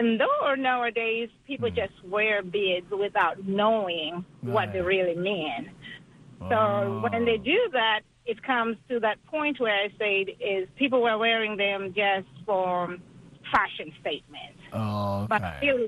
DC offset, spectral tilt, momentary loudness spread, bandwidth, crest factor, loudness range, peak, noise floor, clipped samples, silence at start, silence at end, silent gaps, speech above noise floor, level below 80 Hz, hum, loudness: under 0.1%; -6.5 dB/octave; 11 LU; 12.5 kHz; 20 dB; 3 LU; -6 dBFS; -48 dBFS; under 0.1%; 0 s; 0 s; none; 21 dB; -58 dBFS; none; -26 LUFS